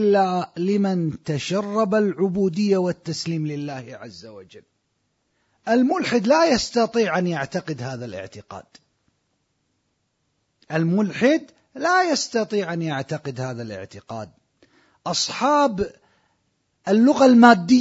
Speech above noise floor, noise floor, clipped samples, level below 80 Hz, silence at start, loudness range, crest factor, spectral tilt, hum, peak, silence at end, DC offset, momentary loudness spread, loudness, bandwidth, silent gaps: 51 dB; -72 dBFS; under 0.1%; -58 dBFS; 0 s; 7 LU; 22 dB; -5.5 dB/octave; none; 0 dBFS; 0 s; under 0.1%; 18 LU; -20 LUFS; 8 kHz; none